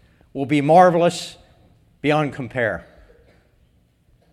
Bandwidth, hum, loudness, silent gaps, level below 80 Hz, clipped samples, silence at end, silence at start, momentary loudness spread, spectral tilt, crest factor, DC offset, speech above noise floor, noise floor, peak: 13 kHz; none; -18 LUFS; none; -54 dBFS; under 0.1%; 1.55 s; 0.35 s; 19 LU; -6 dB/octave; 20 dB; under 0.1%; 41 dB; -59 dBFS; 0 dBFS